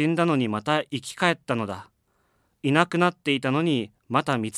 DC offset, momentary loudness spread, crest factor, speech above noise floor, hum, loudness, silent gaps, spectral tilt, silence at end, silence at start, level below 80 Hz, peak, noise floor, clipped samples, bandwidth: under 0.1%; 8 LU; 22 dB; 44 dB; none; -24 LUFS; none; -5.5 dB/octave; 0 s; 0 s; -70 dBFS; -2 dBFS; -69 dBFS; under 0.1%; 13.5 kHz